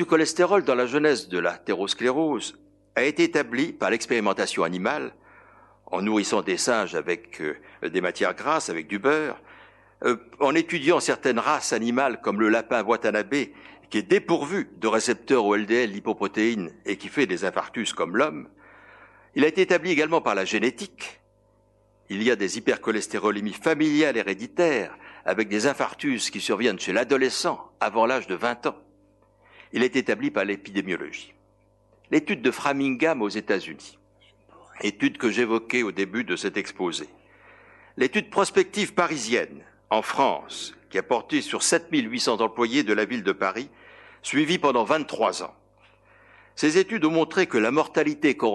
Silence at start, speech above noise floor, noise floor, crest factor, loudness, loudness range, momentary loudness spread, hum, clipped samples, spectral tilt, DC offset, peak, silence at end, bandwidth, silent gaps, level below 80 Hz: 0 s; 38 dB; -62 dBFS; 20 dB; -24 LUFS; 3 LU; 9 LU; 50 Hz at -60 dBFS; under 0.1%; -3.5 dB/octave; under 0.1%; -6 dBFS; 0 s; 12 kHz; none; -68 dBFS